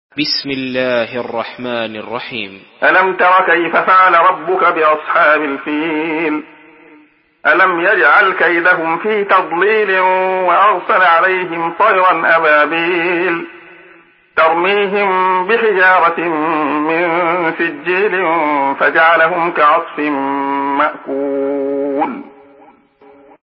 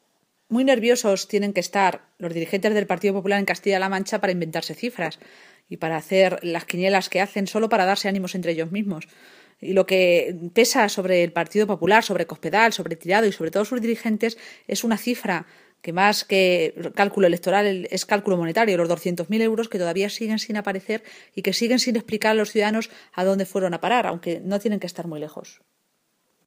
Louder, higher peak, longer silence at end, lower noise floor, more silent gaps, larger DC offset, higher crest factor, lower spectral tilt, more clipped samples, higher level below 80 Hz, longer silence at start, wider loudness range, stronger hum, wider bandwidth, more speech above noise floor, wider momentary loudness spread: first, -13 LUFS vs -22 LUFS; about the same, 0 dBFS vs 0 dBFS; first, 1.15 s vs 0.95 s; second, -48 dBFS vs -71 dBFS; neither; neither; second, 14 dB vs 22 dB; first, -8 dB/octave vs -4.5 dB/octave; neither; first, -64 dBFS vs -72 dBFS; second, 0.15 s vs 0.5 s; about the same, 4 LU vs 4 LU; neither; second, 5.8 kHz vs 15.5 kHz; second, 35 dB vs 48 dB; about the same, 11 LU vs 10 LU